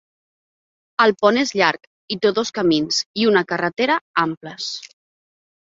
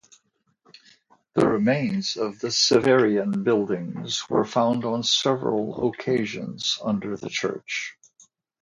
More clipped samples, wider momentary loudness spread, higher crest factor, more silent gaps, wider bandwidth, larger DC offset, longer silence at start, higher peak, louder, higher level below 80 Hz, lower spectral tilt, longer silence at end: neither; about the same, 11 LU vs 10 LU; about the same, 20 dB vs 18 dB; first, 1.87-2.08 s, 3.06-3.14 s, 4.01-4.14 s, 4.37-4.41 s vs none; second, 7.8 kHz vs 11 kHz; neither; second, 1 s vs 1.35 s; first, -2 dBFS vs -6 dBFS; first, -19 LUFS vs -23 LUFS; about the same, -62 dBFS vs -62 dBFS; about the same, -3.5 dB/octave vs -4 dB/octave; about the same, 0.8 s vs 0.7 s